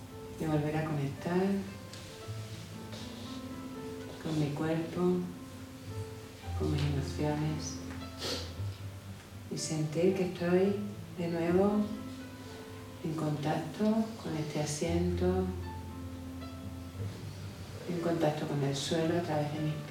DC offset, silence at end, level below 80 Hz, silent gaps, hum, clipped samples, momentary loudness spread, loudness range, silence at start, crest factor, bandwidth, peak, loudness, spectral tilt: under 0.1%; 0 s; -54 dBFS; none; none; under 0.1%; 14 LU; 5 LU; 0 s; 18 dB; 17.5 kHz; -16 dBFS; -34 LUFS; -6 dB/octave